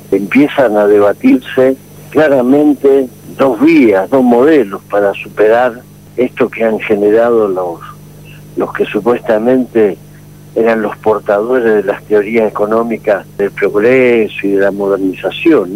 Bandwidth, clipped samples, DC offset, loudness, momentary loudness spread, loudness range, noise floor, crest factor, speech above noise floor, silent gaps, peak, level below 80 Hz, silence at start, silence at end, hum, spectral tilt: 16 kHz; under 0.1%; 0.2%; -11 LUFS; 9 LU; 4 LU; -35 dBFS; 10 dB; 25 dB; none; 0 dBFS; -48 dBFS; 0.1 s; 0 s; 50 Hz at -40 dBFS; -7 dB/octave